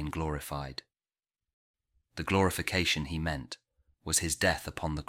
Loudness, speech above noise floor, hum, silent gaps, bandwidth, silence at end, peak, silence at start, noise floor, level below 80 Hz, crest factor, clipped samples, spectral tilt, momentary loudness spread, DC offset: -31 LUFS; over 58 dB; none; 1.54-1.74 s; 16.5 kHz; 0.05 s; -12 dBFS; 0 s; under -90 dBFS; -48 dBFS; 22 dB; under 0.1%; -3.5 dB/octave; 18 LU; under 0.1%